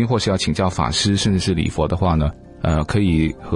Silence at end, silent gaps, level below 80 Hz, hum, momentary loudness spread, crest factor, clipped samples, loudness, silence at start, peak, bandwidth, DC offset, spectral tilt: 0 s; none; -32 dBFS; none; 4 LU; 14 dB; under 0.1%; -19 LUFS; 0 s; -6 dBFS; 11.5 kHz; under 0.1%; -5.5 dB/octave